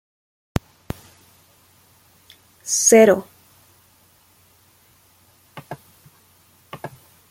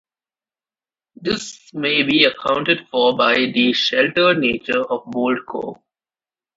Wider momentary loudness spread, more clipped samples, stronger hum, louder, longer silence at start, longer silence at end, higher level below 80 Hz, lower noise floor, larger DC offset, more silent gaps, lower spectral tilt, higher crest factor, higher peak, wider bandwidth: first, 28 LU vs 11 LU; neither; neither; about the same, -16 LUFS vs -17 LUFS; first, 2.65 s vs 1.2 s; second, 0.45 s vs 0.85 s; first, -50 dBFS vs -58 dBFS; second, -56 dBFS vs under -90 dBFS; neither; neither; about the same, -3.5 dB/octave vs -4 dB/octave; about the same, 22 dB vs 20 dB; about the same, -2 dBFS vs 0 dBFS; first, 16.5 kHz vs 8 kHz